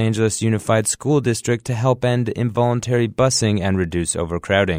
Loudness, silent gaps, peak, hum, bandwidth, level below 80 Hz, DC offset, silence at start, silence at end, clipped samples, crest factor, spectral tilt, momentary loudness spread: -19 LUFS; none; -2 dBFS; none; 16 kHz; -44 dBFS; under 0.1%; 0 s; 0 s; under 0.1%; 16 dB; -5 dB/octave; 4 LU